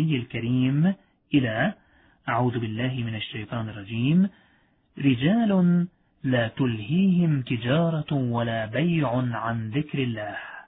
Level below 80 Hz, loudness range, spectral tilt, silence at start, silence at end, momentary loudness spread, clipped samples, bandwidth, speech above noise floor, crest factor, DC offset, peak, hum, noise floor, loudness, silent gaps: -58 dBFS; 4 LU; -11.5 dB/octave; 0 s; 0.05 s; 11 LU; under 0.1%; 4 kHz; 39 dB; 16 dB; under 0.1%; -8 dBFS; none; -63 dBFS; -25 LUFS; none